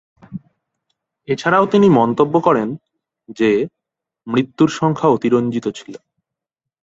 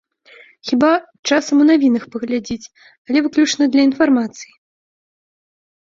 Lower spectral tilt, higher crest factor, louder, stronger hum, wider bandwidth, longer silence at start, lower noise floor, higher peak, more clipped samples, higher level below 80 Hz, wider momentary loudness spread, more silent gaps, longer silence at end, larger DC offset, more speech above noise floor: first, -7 dB/octave vs -3.5 dB/octave; about the same, 16 dB vs 16 dB; about the same, -16 LUFS vs -16 LUFS; neither; about the same, 8 kHz vs 7.6 kHz; second, 0.3 s vs 0.65 s; first, -84 dBFS vs -47 dBFS; about the same, -2 dBFS vs -2 dBFS; neither; about the same, -58 dBFS vs -60 dBFS; first, 22 LU vs 14 LU; second, none vs 1.19-1.23 s, 2.98-3.05 s; second, 0.85 s vs 1.5 s; neither; first, 68 dB vs 31 dB